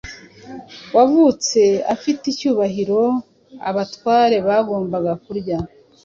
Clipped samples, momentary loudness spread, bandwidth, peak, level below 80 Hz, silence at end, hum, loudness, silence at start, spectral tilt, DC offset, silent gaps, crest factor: under 0.1%; 17 LU; 7.6 kHz; -2 dBFS; -52 dBFS; 0.4 s; none; -18 LUFS; 0.05 s; -5 dB/octave; under 0.1%; none; 16 dB